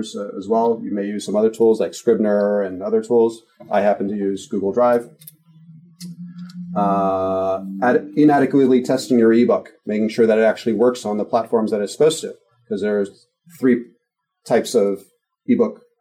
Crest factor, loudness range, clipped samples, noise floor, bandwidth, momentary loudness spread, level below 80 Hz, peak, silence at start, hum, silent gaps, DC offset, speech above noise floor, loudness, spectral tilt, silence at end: 14 dB; 6 LU; under 0.1%; -72 dBFS; 15 kHz; 14 LU; -70 dBFS; -6 dBFS; 0 s; none; none; under 0.1%; 54 dB; -19 LUFS; -6 dB/octave; 0.25 s